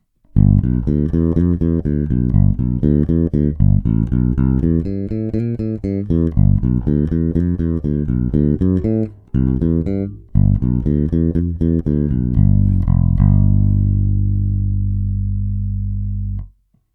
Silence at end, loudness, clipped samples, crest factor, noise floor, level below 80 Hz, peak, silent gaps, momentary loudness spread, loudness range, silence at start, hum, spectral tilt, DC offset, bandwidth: 0.45 s; -17 LUFS; under 0.1%; 16 dB; -45 dBFS; -22 dBFS; 0 dBFS; none; 8 LU; 2 LU; 0.35 s; 50 Hz at -30 dBFS; -13 dB/octave; under 0.1%; 2.4 kHz